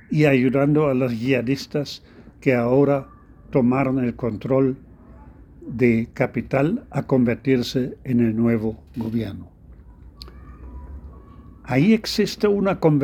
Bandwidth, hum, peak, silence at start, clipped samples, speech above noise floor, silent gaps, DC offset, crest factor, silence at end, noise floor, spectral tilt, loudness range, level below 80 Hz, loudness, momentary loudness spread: 15.5 kHz; none; -2 dBFS; 0.1 s; under 0.1%; 25 dB; none; under 0.1%; 18 dB; 0 s; -45 dBFS; -7.5 dB/octave; 5 LU; -46 dBFS; -21 LUFS; 20 LU